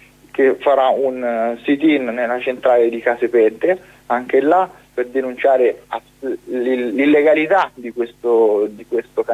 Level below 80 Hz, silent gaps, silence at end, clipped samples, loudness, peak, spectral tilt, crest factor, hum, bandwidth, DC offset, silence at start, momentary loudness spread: -60 dBFS; none; 0 s; under 0.1%; -17 LUFS; -4 dBFS; -6 dB/octave; 14 dB; 50 Hz at -55 dBFS; 12.5 kHz; under 0.1%; 0.35 s; 10 LU